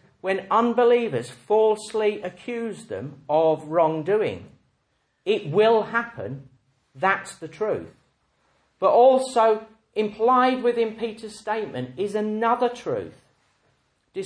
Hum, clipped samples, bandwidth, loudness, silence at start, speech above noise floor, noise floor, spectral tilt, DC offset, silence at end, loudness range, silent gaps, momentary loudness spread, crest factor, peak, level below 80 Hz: none; under 0.1%; 10.5 kHz; -23 LUFS; 0.25 s; 48 dB; -71 dBFS; -5.5 dB/octave; under 0.1%; 0 s; 5 LU; none; 14 LU; 18 dB; -6 dBFS; -68 dBFS